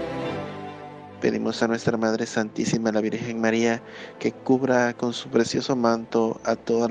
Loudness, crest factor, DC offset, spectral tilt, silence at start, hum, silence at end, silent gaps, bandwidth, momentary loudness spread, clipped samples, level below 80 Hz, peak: -24 LUFS; 18 dB; under 0.1%; -5 dB/octave; 0 s; none; 0 s; none; 9.6 kHz; 10 LU; under 0.1%; -60 dBFS; -6 dBFS